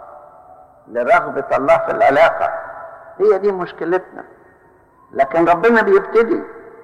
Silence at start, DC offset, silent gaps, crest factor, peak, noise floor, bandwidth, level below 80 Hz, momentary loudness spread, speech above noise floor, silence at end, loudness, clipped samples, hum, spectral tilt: 0 s; under 0.1%; none; 14 dB; -4 dBFS; -50 dBFS; 10.5 kHz; -52 dBFS; 17 LU; 35 dB; 0.15 s; -15 LUFS; under 0.1%; none; -6.5 dB/octave